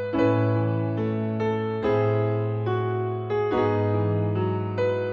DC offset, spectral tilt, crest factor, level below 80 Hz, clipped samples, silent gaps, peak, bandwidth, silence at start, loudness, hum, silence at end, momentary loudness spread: under 0.1%; -9.5 dB/octave; 12 dB; -56 dBFS; under 0.1%; none; -12 dBFS; 5.8 kHz; 0 s; -25 LUFS; none; 0 s; 4 LU